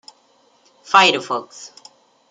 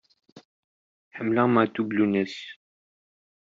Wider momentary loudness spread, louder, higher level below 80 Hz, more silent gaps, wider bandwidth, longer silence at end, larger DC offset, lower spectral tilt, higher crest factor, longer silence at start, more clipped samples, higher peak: first, 25 LU vs 19 LU; first, -16 LUFS vs -24 LUFS; about the same, -76 dBFS vs -72 dBFS; second, none vs 0.45-1.11 s; first, 9.6 kHz vs 7.6 kHz; second, 0.65 s vs 0.95 s; neither; second, -2 dB/octave vs -5.5 dB/octave; about the same, 20 dB vs 20 dB; first, 0.9 s vs 0.35 s; neither; first, -2 dBFS vs -6 dBFS